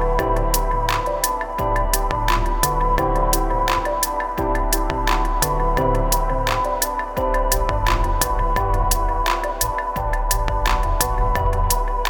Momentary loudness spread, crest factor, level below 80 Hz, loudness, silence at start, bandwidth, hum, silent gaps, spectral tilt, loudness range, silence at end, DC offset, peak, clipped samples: 3 LU; 16 dB; -22 dBFS; -21 LUFS; 0 s; 19.5 kHz; none; none; -4 dB/octave; 1 LU; 0 s; under 0.1%; -4 dBFS; under 0.1%